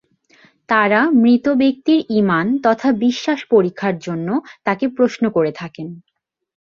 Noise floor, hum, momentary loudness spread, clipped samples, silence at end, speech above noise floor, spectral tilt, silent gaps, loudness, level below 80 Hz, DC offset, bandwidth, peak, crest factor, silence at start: -53 dBFS; none; 9 LU; under 0.1%; 0.65 s; 36 dB; -6.5 dB/octave; none; -17 LUFS; -60 dBFS; under 0.1%; 7.2 kHz; -2 dBFS; 16 dB; 0.7 s